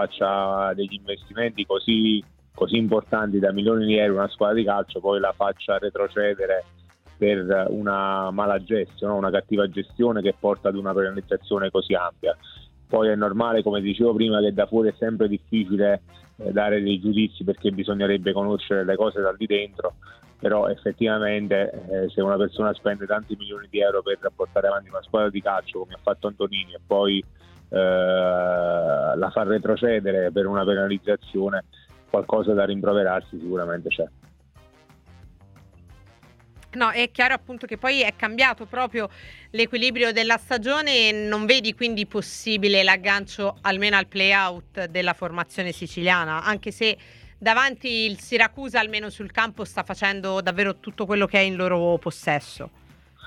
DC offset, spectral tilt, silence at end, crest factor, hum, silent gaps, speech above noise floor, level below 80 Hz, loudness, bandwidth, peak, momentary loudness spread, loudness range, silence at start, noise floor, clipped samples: under 0.1%; -5 dB/octave; 0 s; 22 dB; none; none; 30 dB; -54 dBFS; -23 LUFS; 12 kHz; -2 dBFS; 8 LU; 4 LU; 0 s; -53 dBFS; under 0.1%